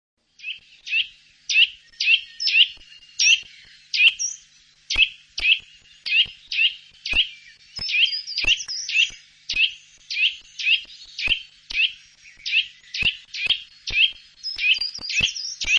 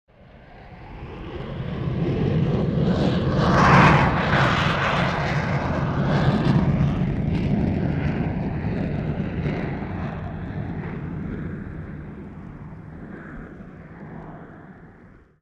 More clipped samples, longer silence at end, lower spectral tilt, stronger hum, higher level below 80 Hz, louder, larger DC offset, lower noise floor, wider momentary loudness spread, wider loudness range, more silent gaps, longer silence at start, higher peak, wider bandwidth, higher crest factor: neither; second, 0 s vs 0.35 s; second, 2 dB/octave vs -7.5 dB/octave; neither; second, -48 dBFS vs -36 dBFS; about the same, -20 LUFS vs -22 LUFS; neither; first, -54 dBFS vs -49 dBFS; second, 16 LU vs 20 LU; second, 4 LU vs 17 LU; neither; about the same, 0.45 s vs 0.35 s; about the same, -4 dBFS vs -2 dBFS; first, 10.5 kHz vs 8.4 kHz; about the same, 20 dB vs 20 dB